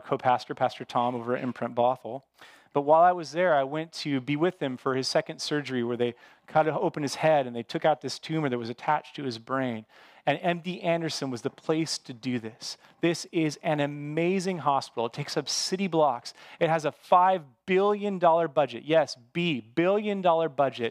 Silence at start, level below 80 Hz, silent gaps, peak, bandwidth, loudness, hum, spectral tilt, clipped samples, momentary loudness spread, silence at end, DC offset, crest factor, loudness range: 0.05 s; -80 dBFS; none; -8 dBFS; 15 kHz; -27 LUFS; none; -5 dB/octave; under 0.1%; 9 LU; 0 s; under 0.1%; 20 dB; 5 LU